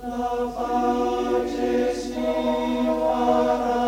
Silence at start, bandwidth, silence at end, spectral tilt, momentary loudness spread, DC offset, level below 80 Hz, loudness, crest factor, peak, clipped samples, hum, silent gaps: 0 s; 16.5 kHz; 0 s; -5 dB/octave; 6 LU; under 0.1%; -44 dBFS; -23 LUFS; 14 dB; -8 dBFS; under 0.1%; none; none